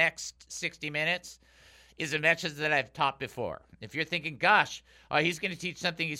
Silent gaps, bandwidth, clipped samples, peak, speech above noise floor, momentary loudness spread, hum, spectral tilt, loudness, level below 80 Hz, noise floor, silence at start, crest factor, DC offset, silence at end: none; 16 kHz; under 0.1%; -8 dBFS; 27 dB; 14 LU; none; -3.5 dB/octave; -29 LUFS; -64 dBFS; -58 dBFS; 0 s; 22 dB; under 0.1%; 0 s